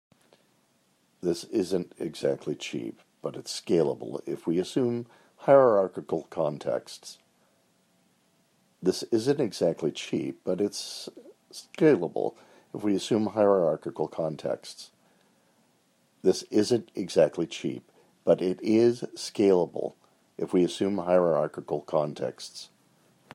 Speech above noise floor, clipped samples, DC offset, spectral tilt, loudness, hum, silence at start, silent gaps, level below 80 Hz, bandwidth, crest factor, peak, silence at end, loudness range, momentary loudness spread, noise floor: 41 dB; under 0.1%; under 0.1%; -5.5 dB/octave; -27 LUFS; none; 1.25 s; none; -74 dBFS; 13 kHz; 22 dB; -6 dBFS; 0.7 s; 5 LU; 17 LU; -68 dBFS